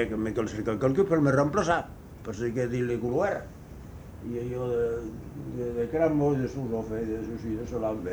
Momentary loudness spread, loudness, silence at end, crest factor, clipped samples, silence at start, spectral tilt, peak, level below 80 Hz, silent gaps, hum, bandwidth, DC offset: 16 LU; -28 LUFS; 0 s; 20 dB; under 0.1%; 0 s; -7.5 dB/octave; -10 dBFS; -48 dBFS; none; none; over 20 kHz; under 0.1%